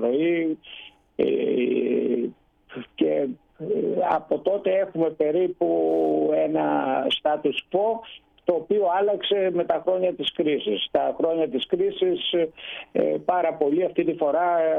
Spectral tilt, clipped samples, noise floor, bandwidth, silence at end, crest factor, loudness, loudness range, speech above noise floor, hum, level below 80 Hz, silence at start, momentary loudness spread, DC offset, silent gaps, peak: -7.5 dB/octave; under 0.1%; -43 dBFS; 4.1 kHz; 0 s; 16 dB; -24 LUFS; 2 LU; 20 dB; none; -64 dBFS; 0 s; 7 LU; under 0.1%; none; -8 dBFS